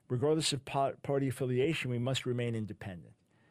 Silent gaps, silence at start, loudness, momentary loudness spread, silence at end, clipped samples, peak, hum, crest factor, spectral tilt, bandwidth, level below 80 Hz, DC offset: none; 0.1 s; -33 LUFS; 12 LU; 0.4 s; under 0.1%; -18 dBFS; none; 16 dB; -5 dB/octave; 15 kHz; -66 dBFS; under 0.1%